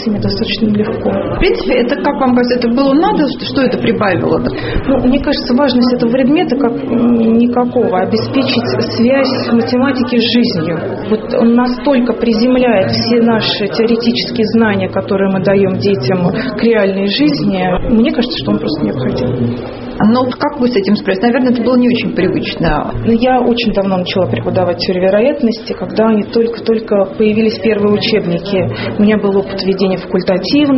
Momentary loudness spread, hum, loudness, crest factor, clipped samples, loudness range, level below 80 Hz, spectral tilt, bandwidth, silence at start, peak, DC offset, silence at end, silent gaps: 5 LU; none; -12 LUFS; 12 dB; under 0.1%; 2 LU; -32 dBFS; -5 dB/octave; 6 kHz; 0 s; 0 dBFS; under 0.1%; 0 s; none